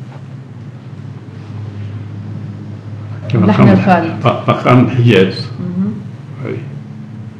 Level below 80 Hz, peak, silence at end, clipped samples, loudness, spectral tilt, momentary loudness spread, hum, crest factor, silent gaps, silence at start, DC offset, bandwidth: -48 dBFS; 0 dBFS; 0 s; 0.6%; -12 LUFS; -8.5 dB/octave; 21 LU; none; 14 dB; none; 0 s; under 0.1%; 8.2 kHz